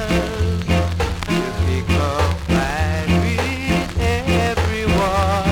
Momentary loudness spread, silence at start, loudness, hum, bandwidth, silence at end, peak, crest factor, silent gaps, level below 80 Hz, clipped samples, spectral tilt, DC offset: 3 LU; 0 s; -19 LUFS; none; 16.5 kHz; 0 s; -4 dBFS; 14 dB; none; -26 dBFS; under 0.1%; -6 dB/octave; under 0.1%